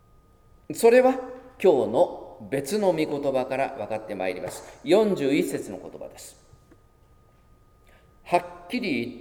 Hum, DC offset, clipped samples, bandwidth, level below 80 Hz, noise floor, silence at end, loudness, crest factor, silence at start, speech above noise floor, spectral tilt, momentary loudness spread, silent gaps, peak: none; under 0.1%; under 0.1%; 18.5 kHz; -58 dBFS; -57 dBFS; 0 s; -24 LUFS; 20 dB; 0.7 s; 33 dB; -5 dB/octave; 19 LU; none; -6 dBFS